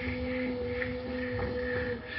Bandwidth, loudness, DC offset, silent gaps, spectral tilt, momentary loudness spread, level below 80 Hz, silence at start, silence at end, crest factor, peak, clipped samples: 5.8 kHz; -34 LUFS; under 0.1%; none; -5 dB/octave; 2 LU; -46 dBFS; 0 s; 0 s; 18 dB; -16 dBFS; under 0.1%